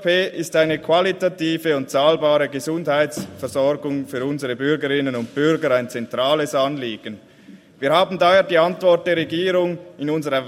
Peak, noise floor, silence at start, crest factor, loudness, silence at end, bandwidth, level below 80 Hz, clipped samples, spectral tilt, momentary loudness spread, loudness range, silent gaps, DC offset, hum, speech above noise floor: -2 dBFS; -45 dBFS; 0 s; 16 dB; -20 LUFS; 0 s; 16 kHz; -64 dBFS; under 0.1%; -5 dB/octave; 9 LU; 3 LU; none; under 0.1%; none; 26 dB